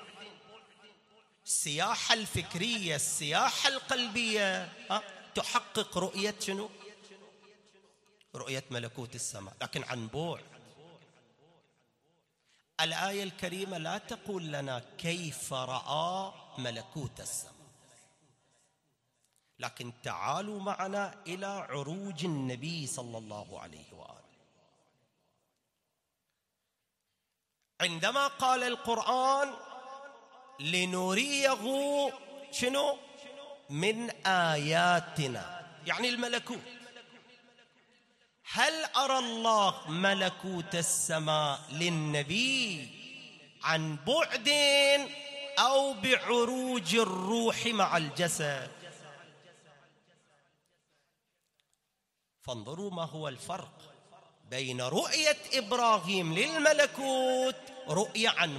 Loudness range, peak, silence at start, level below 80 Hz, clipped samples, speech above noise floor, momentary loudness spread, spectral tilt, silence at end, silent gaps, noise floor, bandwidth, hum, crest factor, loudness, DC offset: 14 LU; -6 dBFS; 0 s; -72 dBFS; under 0.1%; 52 dB; 18 LU; -3 dB/octave; 0 s; none; -84 dBFS; 15.5 kHz; none; 26 dB; -31 LUFS; under 0.1%